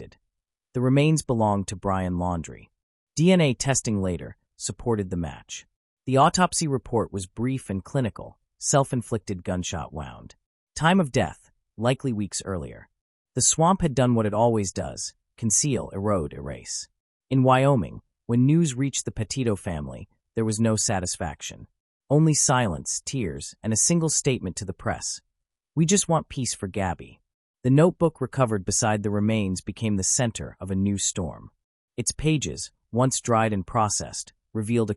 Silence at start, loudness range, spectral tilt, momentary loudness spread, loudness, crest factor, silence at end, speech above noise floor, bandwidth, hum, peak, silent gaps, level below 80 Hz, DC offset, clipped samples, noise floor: 0 s; 4 LU; -5 dB/octave; 14 LU; -24 LUFS; 18 dB; 0 s; 58 dB; 13.5 kHz; none; -6 dBFS; 2.83-3.07 s, 5.76-5.97 s, 10.46-10.67 s, 13.01-13.25 s, 17.00-17.20 s, 21.80-22.00 s, 27.34-27.54 s, 31.64-31.88 s; -50 dBFS; under 0.1%; under 0.1%; -82 dBFS